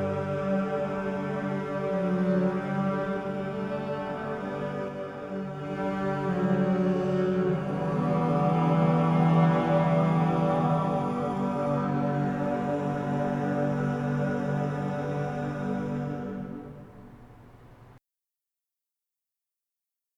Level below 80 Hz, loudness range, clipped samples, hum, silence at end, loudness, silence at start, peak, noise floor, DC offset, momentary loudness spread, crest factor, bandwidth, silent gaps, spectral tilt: -58 dBFS; 10 LU; under 0.1%; none; 2.25 s; -28 LUFS; 0 s; -10 dBFS; -89 dBFS; under 0.1%; 10 LU; 18 dB; 7.6 kHz; none; -9 dB/octave